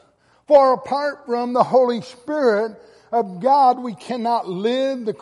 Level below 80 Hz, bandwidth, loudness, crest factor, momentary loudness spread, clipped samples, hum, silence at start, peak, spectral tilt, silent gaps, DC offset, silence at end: -68 dBFS; 11.5 kHz; -19 LUFS; 16 dB; 11 LU; under 0.1%; none; 0.5 s; -2 dBFS; -6 dB/octave; none; under 0.1%; 0.05 s